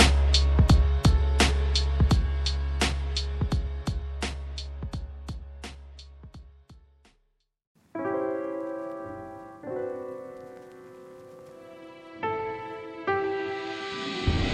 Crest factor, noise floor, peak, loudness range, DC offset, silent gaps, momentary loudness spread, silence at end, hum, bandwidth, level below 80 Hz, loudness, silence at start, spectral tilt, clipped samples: 22 dB; -72 dBFS; -6 dBFS; 15 LU; under 0.1%; 7.67-7.75 s; 24 LU; 0 s; none; 12 kHz; -30 dBFS; -28 LUFS; 0 s; -5 dB/octave; under 0.1%